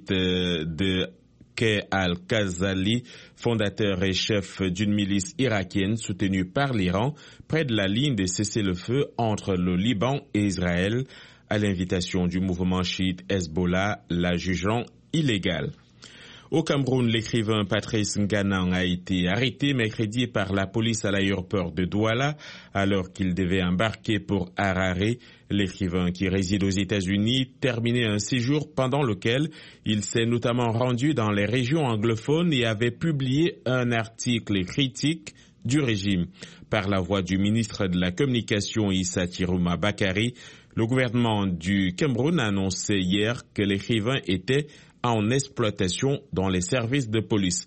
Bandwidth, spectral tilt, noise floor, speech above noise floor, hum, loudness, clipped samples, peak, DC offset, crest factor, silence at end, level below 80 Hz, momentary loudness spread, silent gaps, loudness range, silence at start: 8.8 kHz; -5.5 dB/octave; -48 dBFS; 23 dB; none; -25 LUFS; under 0.1%; -8 dBFS; under 0.1%; 18 dB; 0 s; -52 dBFS; 4 LU; none; 2 LU; 0 s